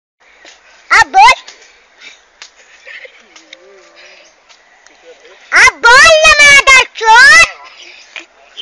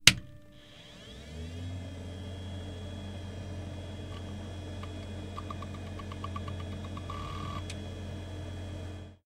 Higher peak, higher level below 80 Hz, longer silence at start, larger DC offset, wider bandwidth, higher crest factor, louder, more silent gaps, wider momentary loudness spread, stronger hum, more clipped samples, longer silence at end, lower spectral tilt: about the same, 0 dBFS vs 0 dBFS; first, -38 dBFS vs -52 dBFS; first, 0.9 s vs 0 s; neither; about the same, 16 kHz vs 16 kHz; second, 10 dB vs 36 dB; first, -4 LUFS vs -38 LUFS; neither; about the same, 8 LU vs 6 LU; neither; neither; about the same, 0 s vs 0.1 s; second, 1 dB/octave vs -2.5 dB/octave